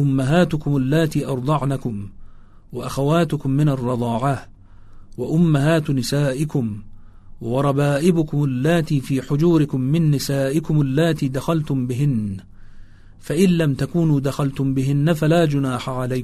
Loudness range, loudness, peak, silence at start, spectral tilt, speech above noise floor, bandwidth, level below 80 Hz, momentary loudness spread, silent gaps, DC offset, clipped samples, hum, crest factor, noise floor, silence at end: 3 LU; -20 LUFS; -4 dBFS; 0 s; -7 dB/octave; 22 dB; 13.5 kHz; -42 dBFS; 9 LU; none; under 0.1%; under 0.1%; none; 16 dB; -40 dBFS; 0 s